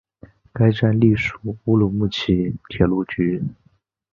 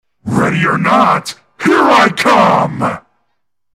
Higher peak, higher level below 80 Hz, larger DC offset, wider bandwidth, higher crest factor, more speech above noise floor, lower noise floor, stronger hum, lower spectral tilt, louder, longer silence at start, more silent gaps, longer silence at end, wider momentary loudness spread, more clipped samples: about the same, -2 dBFS vs 0 dBFS; first, -42 dBFS vs -48 dBFS; second, under 0.1% vs 0.1%; second, 7.2 kHz vs 16 kHz; first, 18 dB vs 12 dB; second, 30 dB vs 60 dB; second, -48 dBFS vs -71 dBFS; neither; first, -8 dB/octave vs -5.5 dB/octave; second, -20 LUFS vs -11 LUFS; first, 0.55 s vs 0.25 s; neither; second, 0.6 s vs 0.75 s; about the same, 10 LU vs 10 LU; neither